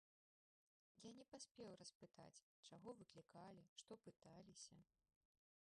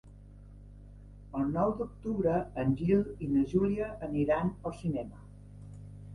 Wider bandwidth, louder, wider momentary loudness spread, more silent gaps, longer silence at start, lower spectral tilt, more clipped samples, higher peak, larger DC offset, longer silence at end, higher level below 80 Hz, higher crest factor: about the same, 10.5 kHz vs 11 kHz; second, -63 LUFS vs -31 LUFS; second, 7 LU vs 20 LU; first, 1.51-1.55 s, 1.95-2.00 s, 2.42-2.63 s, 3.69-3.76 s vs none; first, 0.95 s vs 0.05 s; second, -4 dB/octave vs -9.5 dB/octave; neither; second, -46 dBFS vs -16 dBFS; neither; first, 0.9 s vs 0 s; second, under -90 dBFS vs -50 dBFS; about the same, 18 dB vs 18 dB